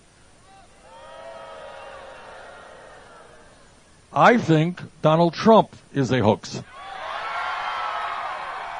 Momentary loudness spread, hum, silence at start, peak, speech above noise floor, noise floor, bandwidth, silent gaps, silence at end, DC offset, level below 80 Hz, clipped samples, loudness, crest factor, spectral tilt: 25 LU; none; 0.9 s; -2 dBFS; 34 dB; -52 dBFS; 10 kHz; none; 0 s; under 0.1%; -58 dBFS; under 0.1%; -21 LUFS; 22 dB; -6.5 dB/octave